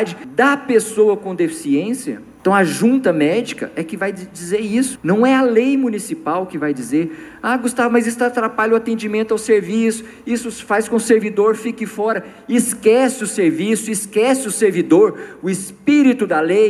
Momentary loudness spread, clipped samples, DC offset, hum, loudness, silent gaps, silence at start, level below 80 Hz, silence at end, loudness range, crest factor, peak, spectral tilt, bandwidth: 10 LU; under 0.1%; under 0.1%; none; -17 LUFS; none; 0 s; -60 dBFS; 0 s; 2 LU; 16 dB; -2 dBFS; -5 dB/octave; 14 kHz